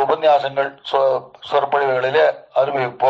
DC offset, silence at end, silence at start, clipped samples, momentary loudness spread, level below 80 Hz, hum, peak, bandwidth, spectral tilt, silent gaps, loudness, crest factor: under 0.1%; 0 s; 0 s; under 0.1%; 6 LU; -68 dBFS; none; -4 dBFS; 7.6 kHz; -5.5 dB/octave; none; -18 LUFS; 14 dB